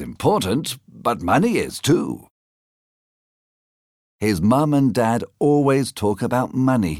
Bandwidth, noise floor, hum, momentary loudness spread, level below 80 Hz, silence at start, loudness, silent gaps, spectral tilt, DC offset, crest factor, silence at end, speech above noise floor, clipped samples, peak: 16.5 kHz; under -90 dBFS; none; 7 LU; -50 dBFS; 0 s; -20 LUFS; 2.30-4.19 s; -6 dB/octave; under 0.1%; 16 dB; 0 s; over 71 dB; under 0.1%; -4 dBFS